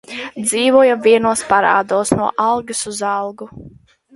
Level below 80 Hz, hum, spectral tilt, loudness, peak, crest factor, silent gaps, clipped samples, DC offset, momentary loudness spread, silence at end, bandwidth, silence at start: -52 dBFS; none; -3.5 dB/octave; -15 LUFS; 0 dBFS; 16 dB; none; under 0.1%; under 0.1%; 14 LU; 0.45 s; 12 kHz; 0.1 s